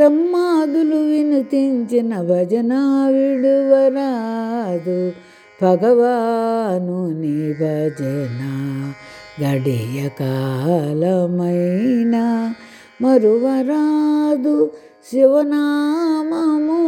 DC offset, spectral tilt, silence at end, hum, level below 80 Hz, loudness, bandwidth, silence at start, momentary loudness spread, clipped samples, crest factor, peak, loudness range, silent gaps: under 0.1%; -8 dB/octave; 0 s; none; -66 dBFS; -17 LUFS; 13 kHz; 0 s; 9 LU; under 0.1%; 16 dB; 0 dBFS; 6 LU; none